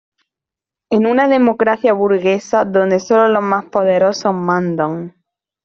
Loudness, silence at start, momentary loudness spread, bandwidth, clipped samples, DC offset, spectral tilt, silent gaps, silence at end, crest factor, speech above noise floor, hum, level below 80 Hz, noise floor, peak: -14 LUFS; 0.9 s; 6 LU; 7.6 kHz; under 0.1%; under 0.1%; -6.5 dB/octave; none; 0.55 s; 14 dB; 72 dB; none; -60 dBFS; -86 dBFS; -2 dBFS